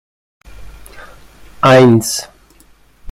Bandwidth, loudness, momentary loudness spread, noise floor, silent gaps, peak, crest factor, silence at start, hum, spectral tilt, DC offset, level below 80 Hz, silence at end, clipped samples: 16 kHz; -10 LUFS; 16 LU; -47 dBFS; none; 0 dBFS; 16 dB; 0.6 s; none; -5.5 dB/octave; under 0.1%; -44 dBFS; 0 s; under 0.1%